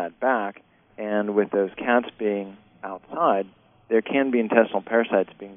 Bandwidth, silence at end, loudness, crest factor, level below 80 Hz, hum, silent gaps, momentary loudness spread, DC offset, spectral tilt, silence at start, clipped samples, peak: 3.8 kHz; 0 s; -23 LUFS; 24 dB; -68 dBFS; none; none; 15 LU; under 0.1%; -4 dB/octave; 0 s; under 0.1%; 0 dBFS